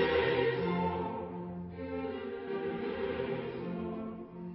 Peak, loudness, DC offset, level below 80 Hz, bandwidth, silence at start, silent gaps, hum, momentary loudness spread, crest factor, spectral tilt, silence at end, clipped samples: -18 dBFS; -36 LUFS; under 0.1%; -56 dBFS; 5.6 kHz; 0 s; none; none; 12 LU; 18 dB; -4.5 dB/octave; 0 s; under 0.1%